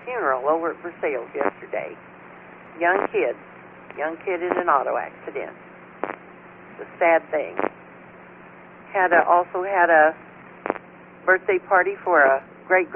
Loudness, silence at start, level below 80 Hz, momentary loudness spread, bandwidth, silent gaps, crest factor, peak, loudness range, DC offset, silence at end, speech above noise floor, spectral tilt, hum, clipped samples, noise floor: -22 LUFS; 0 s; -66 dBFS; 20 LU; 3.5 kHz; none; 20 dB; -4 dBFS; 7 LU; under 0.1%; 0 s; 23 dB; -3 dB/octave; none; under 0.1%; -45 dBFS